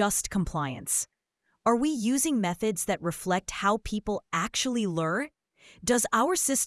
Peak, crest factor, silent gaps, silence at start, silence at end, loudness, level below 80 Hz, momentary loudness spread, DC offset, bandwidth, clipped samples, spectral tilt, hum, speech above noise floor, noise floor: -10 dBFS; 18 dB; none; 0 s; 0 s; -28 LUFS; -52 dBFS; 8 LU; under 0.1%; 12 kHz; under 0.1%; -3.5 dB/octave; none; 48 dB; -76 dBFS